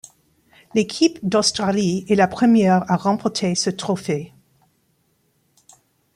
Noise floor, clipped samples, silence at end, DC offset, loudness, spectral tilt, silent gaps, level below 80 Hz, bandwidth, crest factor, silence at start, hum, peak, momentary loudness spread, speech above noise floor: -65 dBFS; under 0.1%; 1.9 s; under 0.1%; -19 LUFS; -5 dB/octave; none; -60 dBFS; 12.5 kHz; 18 dB; 0.75 s; none; -2 dBFS; 9 LU; 47 dB